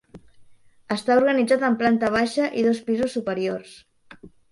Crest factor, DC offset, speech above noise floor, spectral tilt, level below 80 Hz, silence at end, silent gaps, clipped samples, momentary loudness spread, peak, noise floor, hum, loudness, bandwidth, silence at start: 16 dB; under 0.1%; 28 dB; -5.5 dB/octave; -60 dBFS; 0.25 s; none; under 0.1%; 8 LU; -6 dBFS; -50 dBFS; none; -22 LUFS; 11.5 kHz; 0.15 s